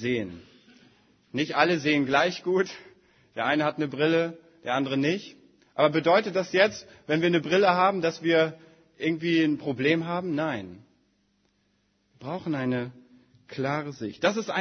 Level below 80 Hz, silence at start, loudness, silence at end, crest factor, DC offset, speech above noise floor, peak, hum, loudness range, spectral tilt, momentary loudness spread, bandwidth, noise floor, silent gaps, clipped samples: -70 dBFS; 0 s; -26 LUFS; 0 s; 22 dB; under 0.1%; 45 dB; -6 dBFS; none; 9 LU; -5.5 dB/octave; 14 LU; 6.6 kHz; -70 dBFS; none; under 0.1%